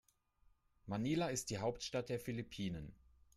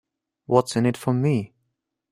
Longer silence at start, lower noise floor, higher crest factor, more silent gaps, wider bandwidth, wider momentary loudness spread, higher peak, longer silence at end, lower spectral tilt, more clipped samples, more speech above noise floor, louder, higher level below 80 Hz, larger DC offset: first, 0.85 s vs 0.5 s; second, -73 dBFS vs -77 dBFS; second, 16 dB vs 22 dB; neither; about the same, 15.5 kHz vs 15 kHz; first, 11 LU vs 6 LU; second, -26 dBFS vs -2 dBFS; second, 0.45 s vs 0.65 s; second, -5 dB/octave vs -7 dB/octave; neither; second, 32 dB vs 56 dB; second, -42 LUFS vs -23 LUFS; about the same, -66 dBFS vs -62 dBFS; neither